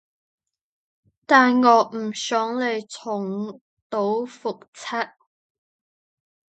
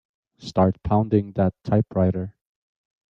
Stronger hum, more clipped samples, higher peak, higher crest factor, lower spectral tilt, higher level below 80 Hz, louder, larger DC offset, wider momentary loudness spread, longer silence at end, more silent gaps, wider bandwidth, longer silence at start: neither; neither; first, 0 dBFS vs -6 dBFS; first, 24 dB vs 18 dB; second, -4 dB/octave vs -9.5 dB/octave; second, -78 dBFS vs -48 dBFS; about the same, -22 LUFS vs -22 LUFS; neither; first, 16 LU vs 10 LU; first, 1.5 s vs 0.8 s; first, 3.61-3.90 s, 4.68-4.73 s vs none; first, 8.8 kHz vs 7.4 kHz; first, 1.3 s vs 0.45 s